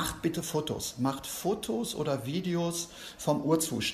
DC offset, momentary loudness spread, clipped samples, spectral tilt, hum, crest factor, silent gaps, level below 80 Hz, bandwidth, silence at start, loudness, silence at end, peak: under 0.1%; 6 LU; under 0.1%; -4.5 dB/octave; none; 18 dB; none; -56 dBFS; 14 kHz; 0 s; -32 LUFS; 0 s; -14 dBFS